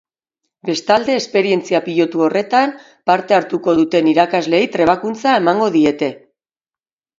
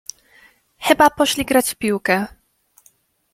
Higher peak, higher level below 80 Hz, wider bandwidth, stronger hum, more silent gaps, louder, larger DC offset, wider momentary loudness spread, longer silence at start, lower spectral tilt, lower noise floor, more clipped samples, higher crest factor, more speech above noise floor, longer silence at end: about the same, 0 dBFS vs 0 dBFS; second, -58 dBFS vs -52 dBFS; second, 7.8 kHz vs 16.5 kHz; neither; neither; about the same, -15 LUFS vs -17 LUFS; neither; second, 7 LU vs 13 LU; second, 0.65 s vs 0.8 s; first, -5 dB/octave vs -3 dB/octave; first, under -90 dBFS vs -58 dBFS; neither; about the same, 16 dB vs 20 dB; first, over 75 dB vs 41 dB; about the same, 1 s vs 1.05 s